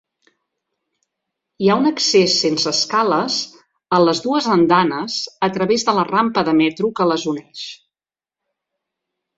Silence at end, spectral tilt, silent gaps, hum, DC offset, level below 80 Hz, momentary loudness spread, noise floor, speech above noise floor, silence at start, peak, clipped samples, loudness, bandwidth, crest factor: 1.6 s; -4 dB/octave; none; none; under 0.1%; -60 dBFS; 9 LU; under -90 dBFS; over 73 dB; 1.6 s; -2 dBFS; under 0.1%; -17 LUFS; 7.8 kHz; 18 dB